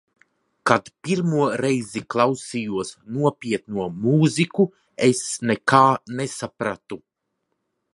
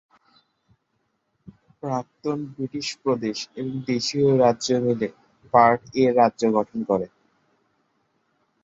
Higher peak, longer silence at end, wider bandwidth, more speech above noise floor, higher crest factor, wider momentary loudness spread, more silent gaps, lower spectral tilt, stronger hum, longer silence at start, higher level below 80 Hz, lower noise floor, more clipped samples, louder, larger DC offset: about the same, 0 dBFS vs -2 dBFS; second, 1 s vs 1.55 s; first, 11.5 kHz vs 8 kHz; first, 55 dB vs 51 dB; about the same, 22 dB vs 22 dB; about the same, 11 LU vs 12 LU; neither; about the same, -5.5 dB/octave vs -5.5 dB/octave; neither; second, 0.65 s vs 1.85 s; about the same, -62 dBFS vs -62 dBFS; first, -77 dBFS vs -73 dBFS; neither; about the same, -22 LUFS vs -23 LUFS; neither